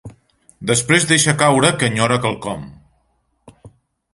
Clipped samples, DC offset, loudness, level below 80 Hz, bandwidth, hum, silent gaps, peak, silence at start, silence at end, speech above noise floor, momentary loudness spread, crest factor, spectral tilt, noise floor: under 0.1%; under 0.1%; -15 LUFS; -50 dBFS; 11.5 kHz; none; none; 0 dBFS; 0.05 s; 0.45 s; 49 dB; 15 LU; 18 dB; -3.5 dB/octave; -64 dBFS